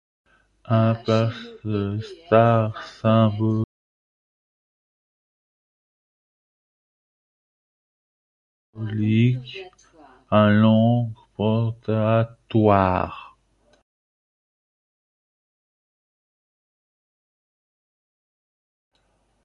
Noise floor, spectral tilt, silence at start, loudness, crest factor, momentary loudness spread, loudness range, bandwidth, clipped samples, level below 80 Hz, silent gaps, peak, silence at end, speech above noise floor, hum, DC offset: -67 dBFS; -9 dB/octave; 0.7 s; -21 LUFS; 22 dB; 14 LU; 9 LU; 6.8 kHz; under 0.1%; -52 dBFS; 3.64-8.73 s; -2 dBFS; 6.15 s; 47 dB; none; under 0.1%